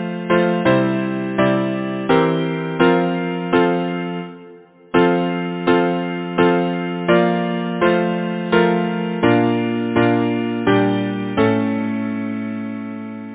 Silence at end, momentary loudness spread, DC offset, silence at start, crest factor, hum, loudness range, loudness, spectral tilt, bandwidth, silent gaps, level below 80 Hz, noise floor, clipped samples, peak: 0 s; 8 LU; under 0.1%; 0 s; 16 dB; none; 2 LU; -18 LUFS; -11 dB/octave; 4 kHz; none; -52 dBFS; -43 dBFS; under 0.1%; -2 dBFS